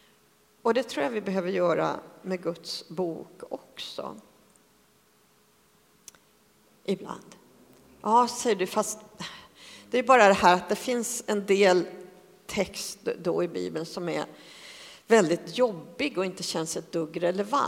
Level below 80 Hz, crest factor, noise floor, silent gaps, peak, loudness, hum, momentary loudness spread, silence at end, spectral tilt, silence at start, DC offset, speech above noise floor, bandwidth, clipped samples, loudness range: -66 dBFS; 24 dB; -63 dBFS; none; -4 dBFS; -27 LUFS; none; 19 LU; 0 s; -4 dB/octave; 0.65 s; under 0.1%; 37 dB; 16 kHz; under 0.1%; 18 LU